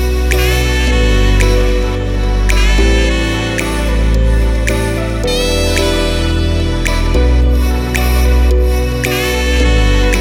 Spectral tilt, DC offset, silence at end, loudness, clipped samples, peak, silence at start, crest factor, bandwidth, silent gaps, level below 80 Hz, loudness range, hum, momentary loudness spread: -5 dB/octave; under 0.1%; 0 s; -13 LUFS; under 0.1%; 0 dBFS; 0 s; 12 dB; 16 kHz; none; -12 dBFS; 1 LU; none; 4 LU